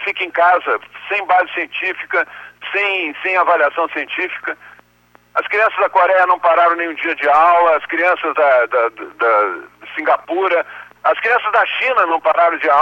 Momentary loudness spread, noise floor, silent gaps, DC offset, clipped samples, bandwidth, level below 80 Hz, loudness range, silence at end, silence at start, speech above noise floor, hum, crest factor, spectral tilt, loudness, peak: 9 LU; -52 dBFS; none; under 0.1%; under 0.1%; 16 kHz; -66 dBFS; 4 LU; 0 s; 0 s; 37 dB; 60 Hz at -60 dBFS; 14 dB; -3.5 dB/octave; -15 LUFS; -2 dBFS